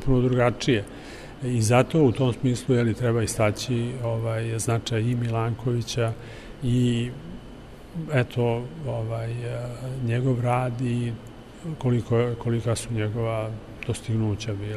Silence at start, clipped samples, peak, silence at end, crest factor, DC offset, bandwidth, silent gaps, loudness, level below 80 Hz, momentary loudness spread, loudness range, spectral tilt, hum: 0 s; under 0.1%; -6 dBFS; 0 s; 20 dB; under 0.1%; 13 kHz; none; -25 LUFS; -44 dBFS; 15 LU; 5 LU; -6.5 dB/octave; none